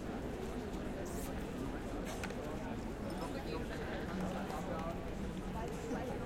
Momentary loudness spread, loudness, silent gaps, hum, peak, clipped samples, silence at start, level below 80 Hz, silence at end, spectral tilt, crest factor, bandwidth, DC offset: 2 LU; -42 LUFS; none; none; -26 dBFS; under 0.1%; 0 s; -50 dBFS; 0 s; -6 dB/octave; 14 dB; 16.5 kHz; under 0.1%